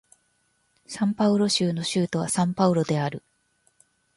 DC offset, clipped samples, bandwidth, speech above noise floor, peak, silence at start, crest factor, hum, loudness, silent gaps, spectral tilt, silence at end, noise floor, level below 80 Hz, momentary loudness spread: under 0.1%; under 0.1%; 11.5 kHz; 46 dB; -6 dBFS; 0.9 s; 20 dB; none; -24 LUFS; none; -5 dB/octave; 1 s; -69 dBFS; -64 dBFS; 8 LU